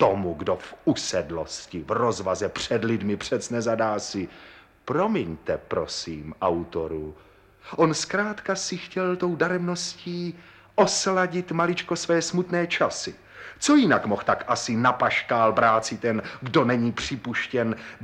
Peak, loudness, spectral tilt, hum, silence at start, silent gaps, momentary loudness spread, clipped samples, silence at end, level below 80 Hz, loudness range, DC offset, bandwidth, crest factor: -6 dBFS; -25 LUFS; -4.5 dB/octave; none; 0 s; none; 11 LU; under 0.1%; 0 s; -56 dBFS; 5 LU; under 0.1%; 12 kHz; 18 dB